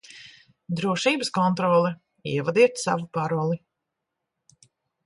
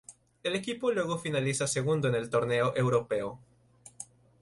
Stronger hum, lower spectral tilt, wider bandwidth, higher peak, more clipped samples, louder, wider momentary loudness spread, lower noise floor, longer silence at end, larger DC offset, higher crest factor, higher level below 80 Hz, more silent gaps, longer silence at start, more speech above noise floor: neither; about the same, -5.5 dB/octave vs -5 dB/octave; about the same, 11.5 kHz vs 11.5 kHz; first, -6 dBFS vs -14 dBFS; neither; first, -24 LUFS vs -30 LUFS; second, 13 LU vs 16 LU; first, -83 dBFS vs -58 dBFS; first, 1.5 s vs 0.35 s; neither; about the same, 20 dB vs 16 dB; about the same, -68 dBFS vs -64 dBFS; neither; about the same, 0.1 s vs 0.1 s; first, 60 dB vs 28 dB